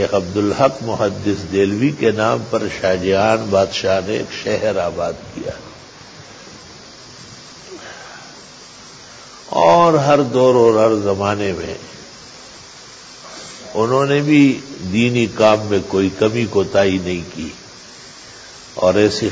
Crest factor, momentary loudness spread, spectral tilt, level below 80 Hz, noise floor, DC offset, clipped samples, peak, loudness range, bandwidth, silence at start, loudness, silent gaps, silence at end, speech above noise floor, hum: 16 dB; 24 LU; -5.5 dB/octave; -46 dBFS; -39 dBFS; under 0.1%; under 0.1%; -2 dBFS; 16 LU; 8 kHz; 0 s; -16 LUFS; none; 0 s; 23 dB; none